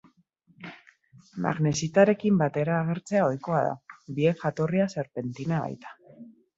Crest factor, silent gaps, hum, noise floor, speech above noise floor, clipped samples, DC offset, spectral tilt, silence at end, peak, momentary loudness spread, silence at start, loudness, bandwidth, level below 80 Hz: 22 dB; none; none; -64 dBFS; 38 dB; under 0.1%; under 0.1%; -6.5 dB/octave; 0.3 s; -6 dBFS; 22 LU; 0.6 s; -26 LUFS; 8 kHz; -66 dBFS